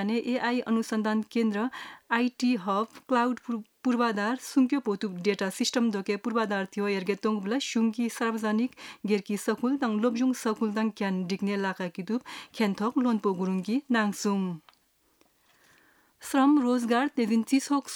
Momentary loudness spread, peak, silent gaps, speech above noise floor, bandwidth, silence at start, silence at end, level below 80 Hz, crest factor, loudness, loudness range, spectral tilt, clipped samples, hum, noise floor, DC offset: 6 LU; -10 dBFS; none; 39 dB; 17.5 kHz; 0 s; 0 s; -78 dBFS; 18 dB; -28 LUFS; 2 LU; -5 dB/octave; under 0.1%; none; -67 dBFS; under 0.1%